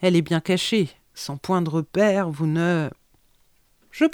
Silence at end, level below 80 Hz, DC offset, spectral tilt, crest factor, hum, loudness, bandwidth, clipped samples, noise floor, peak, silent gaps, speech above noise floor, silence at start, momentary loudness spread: 0 s; -60 dBFS; under 0.1%; -6 dB/octave; 16 dB; none; -23 LUFS; 18.5 kHz; under 0.1%; -61 dBFS; -6 dBFS; none; 39 dB; 0 s; 12 LU